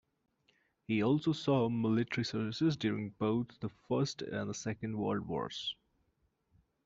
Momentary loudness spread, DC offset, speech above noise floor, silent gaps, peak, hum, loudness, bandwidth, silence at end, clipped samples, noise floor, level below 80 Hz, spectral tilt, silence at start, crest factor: 8 LU; under 0.1%; 44 dB; none; -18 dBFS; none; -35 LUFS; 7.8 kHz; 1.15 s; under 0.1%; -78 dBFS; -70 dBFS; -6 dB/octave; 0.9 s; 18 dB